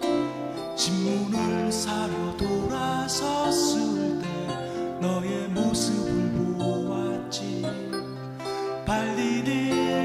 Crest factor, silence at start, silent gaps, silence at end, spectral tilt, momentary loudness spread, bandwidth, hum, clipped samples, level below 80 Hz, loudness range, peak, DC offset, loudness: 16 dB; 0 s; none; 0 s; -4.5 dB/octave; 7 LU; 15.5 kHz; none; under 0.1%; -50 dBFS; 3 LU; -10 dBFS; under 0.1%; -27 LUFS